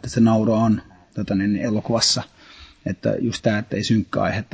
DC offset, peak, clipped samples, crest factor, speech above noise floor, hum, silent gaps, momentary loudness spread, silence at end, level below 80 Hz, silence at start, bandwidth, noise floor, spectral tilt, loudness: under 0.1%; -4 dBFS; under 0.1%; 16 dB; 26 dB; none; none; 13 LU; 0.1 s; -46 dBFS; 0.05 s; 8 kHz; -46 dBFS; -5 dB/octave; -21 LUFS